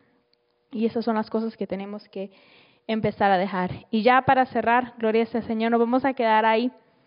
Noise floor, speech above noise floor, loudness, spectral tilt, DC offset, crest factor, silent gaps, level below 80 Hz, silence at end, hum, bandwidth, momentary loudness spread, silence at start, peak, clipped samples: -68 dBFS; 45 dB; -23 LUFS; -4 dB/octave; under 0.1%; 18 dB; none; -60 dBFS; 0.35 s; none; 5.4 kHz; 16 LU; 0.7 s; -6 dBFS; under 0.1%